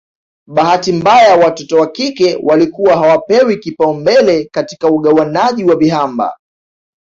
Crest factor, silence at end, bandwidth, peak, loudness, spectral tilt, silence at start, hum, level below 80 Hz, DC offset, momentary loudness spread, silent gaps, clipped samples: 10 dB; 0.65 s; 7.8 kHz; 0 dBFS; -11 LUFS; -5.5 dB/octave; 0.5 s; none; -52 dBFS; under 0.1%; 8 LU; none; under 0.1%